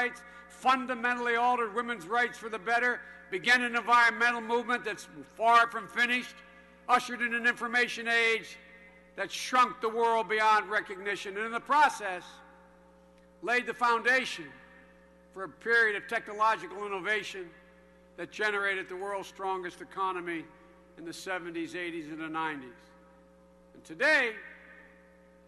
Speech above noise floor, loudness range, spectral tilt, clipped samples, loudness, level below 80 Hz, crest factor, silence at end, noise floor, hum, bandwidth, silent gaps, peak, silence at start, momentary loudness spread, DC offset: 29 dB; 9 LU; -2.5 dB/octave; under 0.1%; -29 LUFS; -70 dBFS; 22 dB; 0.65 s; -59 dBFS; none; 12 kHz; none; -8 dBFS; 0 s; 17 LU; under 0.1%